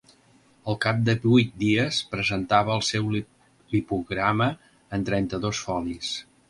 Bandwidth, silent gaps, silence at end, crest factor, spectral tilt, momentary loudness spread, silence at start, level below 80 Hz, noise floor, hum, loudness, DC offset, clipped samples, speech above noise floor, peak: 11.5 kHz; none; 0.3 s; 20 dB; -5.5 dB/octave; 11 LU; 0.65 s; -52 dBFS; -59 dBFS; none; -25 LUFS; under 0.1%; under 0.1%; 34 dB; -4 dBFS